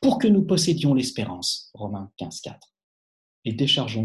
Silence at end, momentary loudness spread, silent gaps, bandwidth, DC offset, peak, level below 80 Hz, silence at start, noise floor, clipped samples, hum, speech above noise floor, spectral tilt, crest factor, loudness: 0 s; 16 LU; 2.83-3.42 s; 12.5 kHz; under 0.1%; -8 dBFS; -58 dBFS; 0 s; under -90 dBFS; under 0.1%; none; over 67 dB; -5 dB/octave; 16 dB; -23 LUFS